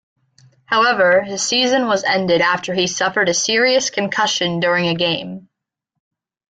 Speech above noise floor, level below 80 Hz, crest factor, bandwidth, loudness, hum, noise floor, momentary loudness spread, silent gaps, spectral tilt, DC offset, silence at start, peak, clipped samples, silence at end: 62 dB; -60 dBFS; 14 dB; 9.4 kHz; -16 LUFS; none; -79 dBFS; 5 LU; none; -2.5 dB/octave; under 0.1%; 0.7 s; -4 dBFS; under 0.1%; 1.1 s